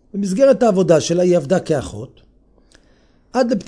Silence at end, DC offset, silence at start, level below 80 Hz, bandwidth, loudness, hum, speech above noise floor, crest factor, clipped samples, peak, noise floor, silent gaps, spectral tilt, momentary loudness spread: 0.05 s; under 0.1%; 0.15 s; -50 dBFS; 10.5 kHz; -16 LUFS; none; 38 dB; 16 dB; under 0.1%; 0 dBFS; -53 dBFS; none; -6 dB/octave; 16 LU